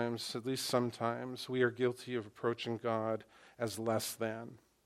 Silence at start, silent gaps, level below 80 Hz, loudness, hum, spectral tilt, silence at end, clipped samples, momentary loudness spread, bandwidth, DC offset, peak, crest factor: 0 s; none; -78 dBFS; -37 LUFS; none; -4.5 dB/octave; 0.3 s; under 0.1%; 8 LU; 16 kHz; under 0.1%; -16 dBFS; 20 dB